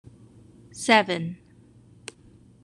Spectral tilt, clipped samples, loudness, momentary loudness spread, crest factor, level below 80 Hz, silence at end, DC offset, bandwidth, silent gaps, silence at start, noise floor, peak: -4 dB/octave; under 0.1%; -23 LUFS; 25 LU; 26 dB; -64 dBFS; 1.3 s; under 0.1%; 13 kHz; none; 0.75 s; -54 dBFS; -2 dBFS